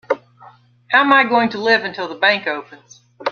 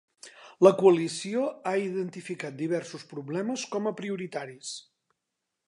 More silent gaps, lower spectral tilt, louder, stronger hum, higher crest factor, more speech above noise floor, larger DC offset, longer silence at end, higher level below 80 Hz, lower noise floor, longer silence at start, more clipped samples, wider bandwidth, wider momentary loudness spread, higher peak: neither; second, -4 dB/octave vs -5.5 dB/octave; first, -16 LUFS vs -28 LUFS; neither; second, 18 dB vs 24 dB; second, 30 dB vs 57 dB; neither; second, 0 s vs 0.9 s; first, -68 dBFS vs -82 dBFS; second, -46 dBFS vs -84 dBFS; second, 0.1 s vs 0.25 s; neither; second, 7 kHz vs 11 kHz; second, 13 LU vs 18 LU; first, 0 dBFS vs -4 dBFS